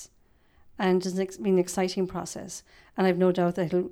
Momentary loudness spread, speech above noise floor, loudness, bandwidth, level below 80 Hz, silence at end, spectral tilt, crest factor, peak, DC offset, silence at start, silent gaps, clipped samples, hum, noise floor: 15 LU; 35 dB; -27 LUFS; 14.5 kHz; -60 dBFS; 0 s; -6 dB/octave; 16 dB; -12 dBFS; under 0.1%; 0 s; none; under 0.1%; none; -62 dBFS